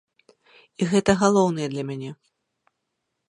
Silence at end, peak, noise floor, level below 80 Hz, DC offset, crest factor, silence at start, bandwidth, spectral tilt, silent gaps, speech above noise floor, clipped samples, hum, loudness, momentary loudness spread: 1.15 s; -4 dBFS; -79 dBFS; -56 dBFS; under 0.1%; 22 dB; 0.8 s; 10.5 kHz; -5.5 dB/octave; none; 57 dB; under 0.1%; none; -22 LUFS; 15 LU